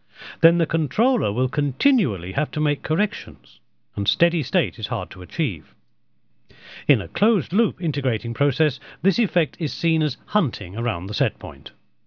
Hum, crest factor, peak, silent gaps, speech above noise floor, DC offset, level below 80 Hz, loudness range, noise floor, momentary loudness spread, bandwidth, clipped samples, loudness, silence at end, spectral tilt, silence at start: none; 22 dB; 0 dBFS; none; 47 dB; under 0.1%; -54 dBFS; 3 LU; -69 dBFS; 14 LU; 5.4 kHz; under 0.1%; -22 LUFS; 0.4 s; -7.5 dB/octave; 0.2 s